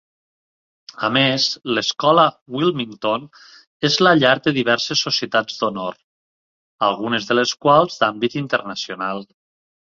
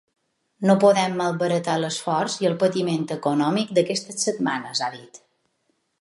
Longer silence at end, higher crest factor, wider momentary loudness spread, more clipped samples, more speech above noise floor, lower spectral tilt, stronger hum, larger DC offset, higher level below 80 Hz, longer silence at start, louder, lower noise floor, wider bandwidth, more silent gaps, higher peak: second, 0.7 s vs 0.85 s; about the same, 20 dB vs 20 dB; about the same, 10 LU vs 8 LU; neither; first, over 71 dB vs 49 dB; about the same, -4 dB/octave vs -4.5 dB/octave; neither; neither; first, -62 dBFS vs -74 dBFS; first, 1 s vs 0.6 s; first, -18 LUFS vs -22 LUFS; first, under -90 dBFS vs -71 dBFS; second, 7.6 kHz vs 11.5 kHz; first, 2.41-2.46 s, 3.67-3.80 s, 6.04-6.79 s vs none; first, 0 dBFS vs -4 dBFS